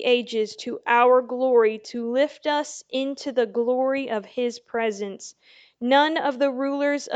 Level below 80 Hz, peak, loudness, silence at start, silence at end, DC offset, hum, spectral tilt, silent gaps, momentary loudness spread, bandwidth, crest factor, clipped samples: -78 dBFS; -6 dBFS; -23 LUFS; 0 s; 0 s; under 0.1%; none; -3 dB/octave; none; 11 LU; 8.8 kHz; 18 dB; under 0.1%